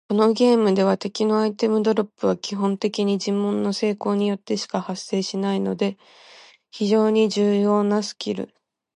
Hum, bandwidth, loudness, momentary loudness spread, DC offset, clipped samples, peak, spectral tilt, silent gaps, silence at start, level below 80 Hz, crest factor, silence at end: none; 10.5 kHz; -22 LUFS; 9 LU; under 0.1%; under 0.1%; -6 dBFS; -6 dB/octave; none; 0.1 s; -70 dBFS; 14 dB; 0.5 s